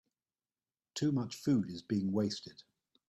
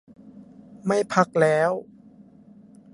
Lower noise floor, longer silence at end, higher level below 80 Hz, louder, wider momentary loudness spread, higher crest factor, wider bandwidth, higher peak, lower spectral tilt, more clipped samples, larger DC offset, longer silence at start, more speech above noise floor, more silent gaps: first, under -90 dBFS vs -50 dBFS; second, 0.45 s vs 1.1 s; second, -74 dBFS vs -68 dBFS; second, -35 LUFS vs -22 LUFS; about the same, 11 LU vs 11 LU; second, 16 dB vs 22 dB; first, 13 kHz vs 11.5 kHz; second, -20 dBFS vs -2 dBFS; about the same, -6.5 dB/octave vs -6 dB/octave; neither; neither; first, 0.95 s vs 0.25 s; first, over 56 dB vs 29 dB; neither